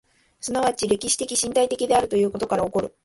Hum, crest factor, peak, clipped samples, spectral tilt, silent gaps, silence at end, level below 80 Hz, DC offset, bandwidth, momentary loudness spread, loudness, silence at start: none; 16 dB; -8 dBFS; under 0.1%; -3 dB/octave; none; 0.15 s; -52 dBFS; under 0.1%; 12 kHz; 5 LU; -22 LUFS; 0.45 s